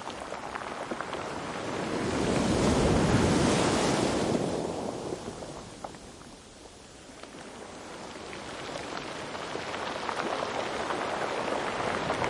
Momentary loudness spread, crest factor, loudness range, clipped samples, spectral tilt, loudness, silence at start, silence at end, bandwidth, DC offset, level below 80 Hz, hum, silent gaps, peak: 20 LU; 20 dB; 15 LU; under 0.1%; -5 dB/octave; -30 LUFS; 0 s; 0 s; 11.5 kHz; under 0.1%; -48 dBFS; none; none; -12 dBFS